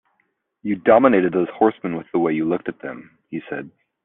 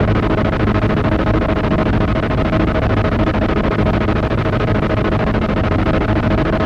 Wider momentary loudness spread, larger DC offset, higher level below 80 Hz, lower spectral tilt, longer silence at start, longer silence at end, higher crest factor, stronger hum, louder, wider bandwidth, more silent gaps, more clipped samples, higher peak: first, 19 LU vs 1 LU; neither; second, -64 dBFS vs -22 dBFS; second, -6 dB/octave vs -8.5 dB/octave; first, 0.65 s vs 0 s; first, 0.35 s vs 0 s; first, 20 dB vs 10 dB; neither; second, -19 LUFS vs -16 LUFS; second, 3.9 kHz vs 7.2 kHz; neither; neither; about the same, -2 dBFS vs -4 dBFS